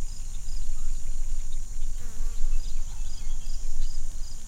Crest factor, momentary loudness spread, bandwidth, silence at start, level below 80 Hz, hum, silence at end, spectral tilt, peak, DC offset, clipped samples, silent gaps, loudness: 12 dB; 4 LU; 9.4 kHz; 0 s; -26 dBFS; none; 0 s; -3.5 dB/octave; -10 dBFS; under 0.1%; under 0.1%; none; -37 LUFS